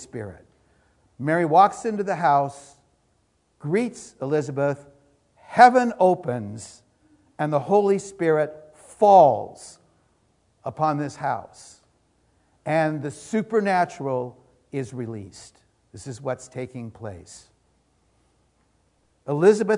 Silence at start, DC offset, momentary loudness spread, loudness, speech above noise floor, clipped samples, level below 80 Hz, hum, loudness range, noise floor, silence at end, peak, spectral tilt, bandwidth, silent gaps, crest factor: 0 s; under 0.1%; 22 LU; -22 LUFS; 45 dB; under 0.1%; -66 dBFS; none; 14 LU; -67 dBFS; 0 s; 0 dBFS; -6.5 dB/octave; 11 kHz; none; 24 dB